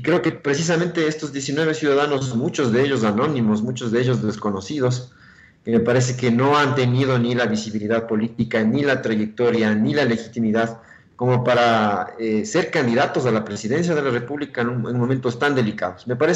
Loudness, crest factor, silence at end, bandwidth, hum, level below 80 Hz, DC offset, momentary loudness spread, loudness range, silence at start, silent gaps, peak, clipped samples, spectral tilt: -20 LUFS; 12 dB; 0 s; 8.2 kHz; none; -58 dBFS; under 0.1%; 7 LU; 2 LU; 0 s; none; -8 dBFS; under 0.1%; -6 dB/octave